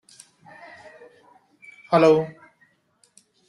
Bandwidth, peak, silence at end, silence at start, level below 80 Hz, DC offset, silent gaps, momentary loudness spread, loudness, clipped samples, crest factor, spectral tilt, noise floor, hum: 11.5 kHz; -4 dBFS; 1.2 s; 1.9 s; -68 dBFS; under 0.1%; none; 28 LU; -20 LUFS; under 0.1%; 22 dB; -6.5 dB/octave; -64 dBFS; none